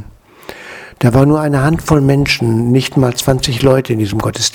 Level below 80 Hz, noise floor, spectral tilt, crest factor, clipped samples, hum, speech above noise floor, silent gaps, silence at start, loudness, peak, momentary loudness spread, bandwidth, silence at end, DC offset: -34 dBFS; -35 dBFS; -5.5 dB/octave; 12 dB; 0.1%; none; 23 dB; none; 0 s; -13 LUFS; 0 dBFS; 19 LU; 19 kHz; 0.05 s; under 0.1%